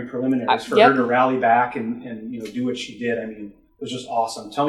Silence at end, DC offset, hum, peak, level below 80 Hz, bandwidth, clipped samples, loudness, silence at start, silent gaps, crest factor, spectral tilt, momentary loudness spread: 0 s; under 0.1%; none; 0 dBFS; -62 dBFS; 12.5 kHz; under 0.1%; -20 LUFS; 0 s; none; 20 dB; -5 dB/octave; 17 LU